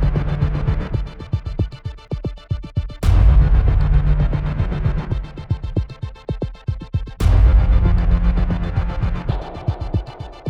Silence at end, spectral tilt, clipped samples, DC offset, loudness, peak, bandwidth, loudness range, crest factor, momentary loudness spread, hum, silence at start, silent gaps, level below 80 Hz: 0 s; -8.5 dB/octave; under 0.1%; under 0.1%; -20 LUFS; -2 dBFS; 6 kHz; 4 LU; 14 dB; 13 LU; none; 0 s; none; -18 dBFS